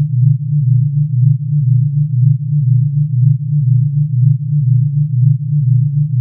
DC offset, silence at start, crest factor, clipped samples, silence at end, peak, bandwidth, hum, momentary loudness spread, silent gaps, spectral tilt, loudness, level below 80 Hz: under 0.1%; 0 s; 10 dB; under 0.1%; 0 s; -2 dBFS; 0.3 kHz; none; 2 LU; none; -23 dB/octave; -13 LUFS; -54 dBFS